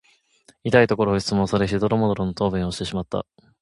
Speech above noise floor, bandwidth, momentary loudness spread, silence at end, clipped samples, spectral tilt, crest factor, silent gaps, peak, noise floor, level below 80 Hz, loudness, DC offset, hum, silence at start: 37 dB; 11.5 kHz; 12 LU; 0.4 s; under 0.1%; -6 dB/octave; 22 dB; none; 0 dBFS; -58 dBFS; -44 dBFS; -22 LUFS; under 0.1%; none; 0.65 s